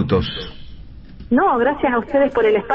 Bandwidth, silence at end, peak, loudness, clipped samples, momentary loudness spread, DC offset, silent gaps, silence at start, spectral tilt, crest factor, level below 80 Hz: 5.8 kHz; 0 s; -6 dBFS; -18 LUFS; under 0.1%; 12 LU; under 0.1%; none; 0 s; -8.5 dB/octave; 12 dB; -38 dBFS